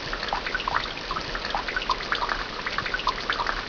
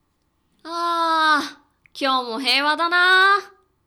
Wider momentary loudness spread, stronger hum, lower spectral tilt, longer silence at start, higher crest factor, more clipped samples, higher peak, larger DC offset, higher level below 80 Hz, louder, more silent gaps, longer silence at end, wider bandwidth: second, 3 LU vs 12 LU; neither; first, -3 dB/octave vs -0.5 dB/octave; second, 0 s vs 0.65 s; first, 20 dB vs 14 dB; neither; about the same, -8 dBFS vs -6 dBFS; neither; first, -42 dBFS vs -72 dBFS; second, -27 LUFS vs -18 LUFS; neither; second, 0 s vs 0.4 s; second, 5.4 kHz vs 20 kHz